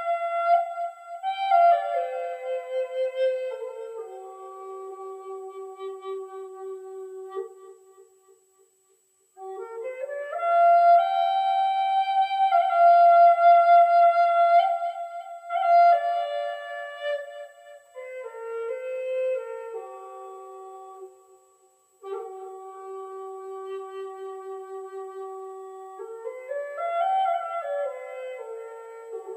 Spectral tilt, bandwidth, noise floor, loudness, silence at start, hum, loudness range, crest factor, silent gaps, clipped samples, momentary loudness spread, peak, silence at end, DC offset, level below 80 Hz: -1 dB/octave; 8.4 kHz; -65 dBFS; -22 LUFS; 0 s; none; 21 LU; 16 dB; none; under 0.1%; 23 LU; -8 dBFS; 0 s; under 0.1%; under -90 dBFS